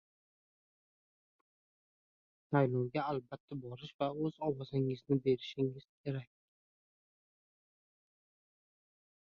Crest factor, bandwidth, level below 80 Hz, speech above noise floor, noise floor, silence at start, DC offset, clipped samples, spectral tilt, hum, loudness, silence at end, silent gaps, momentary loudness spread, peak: 22 dB; 6.6 kHz; -74 dBFS; over 54 dB; under -90 dBFS; 2.5 s; under 0.1%; under 0.1%; -7 dB/octave; none; -37 LUFS; 3.1 s; 3.40-3.48 s, 3.94-3.99 s, 5.89-6.04 s; 13 LU; -18 dBFS